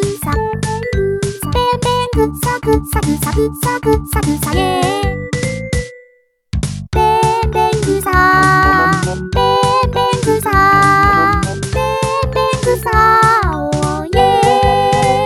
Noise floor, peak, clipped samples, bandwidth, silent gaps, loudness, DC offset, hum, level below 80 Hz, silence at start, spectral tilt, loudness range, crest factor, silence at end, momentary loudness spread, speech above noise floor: -52 dBFS; 0 dBFS; under 0.1%; 17.5 kHz; none; -13 LUFS; under 0.1%; none; -26 dBFS; 0 s; -5 dB/octave; 5 LU; 14 dB; 0 s; 9 LU; 37 dB